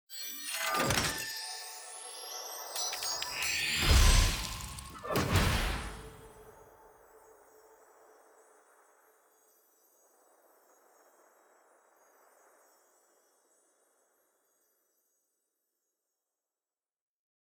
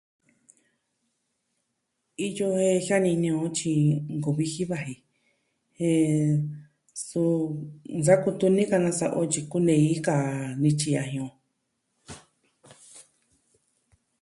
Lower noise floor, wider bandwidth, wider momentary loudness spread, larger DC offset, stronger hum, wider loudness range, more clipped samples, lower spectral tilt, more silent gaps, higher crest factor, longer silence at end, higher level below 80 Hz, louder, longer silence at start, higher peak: first, under -90 dBFS vs -78 dBFS; first, over 20 kHz vs 11.5 kHz; about the same, 17 LU vs 16 LU; neither; neither; about the same, 8 LU vs 6 LU; neither; second, -3 dB/octave vs -6 dB/octave; neither; first, 26 dB vs 20 dB; first, 10.4 s vs 1.2 s; first, -40 dBFS vs -66 dBFS; second, -32 LUFS vs -25 LUFS; second, 0.1 s vs 2.2 s; second, -10 dBFS vs -6 dBFS